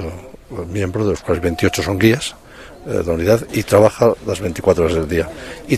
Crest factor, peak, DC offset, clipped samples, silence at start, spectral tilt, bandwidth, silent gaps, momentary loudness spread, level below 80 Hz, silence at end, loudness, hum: 18 dB; 0 dBFS; under 0.1%; under 0.1%; 0 s; -6 dB/octave; 14.5 kHz; none; 16 LU; -38 dBFS; 0 s; -17 LUFS; none